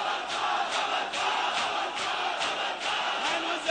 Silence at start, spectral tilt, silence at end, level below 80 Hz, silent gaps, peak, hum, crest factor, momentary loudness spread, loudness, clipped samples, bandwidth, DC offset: 0 s; -0.5 dB/octave; 0 s; -68 dBFS; none; -14 dBFS; none; 14 dB; 2 LU; -28 LUFS; under 0.1%; 9.6 kHz; under 0.1%